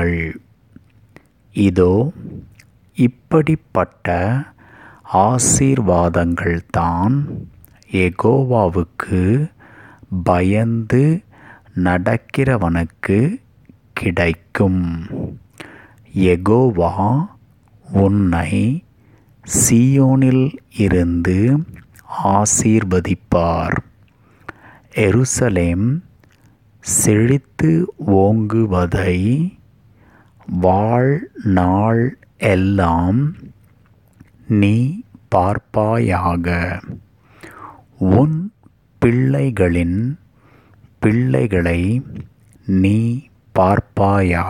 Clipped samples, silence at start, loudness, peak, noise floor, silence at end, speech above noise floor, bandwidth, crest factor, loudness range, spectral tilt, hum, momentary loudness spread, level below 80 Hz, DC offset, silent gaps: under 0.1%; 0 s; -17 LUFS; 0 dBFS; -51 dBFS; 0 s; 36 dB; 16.5 kHz; 16 dB; 4 LU; -6.5 dB/octave; none; 13 LU; -38 dBFS; under 0.1%; none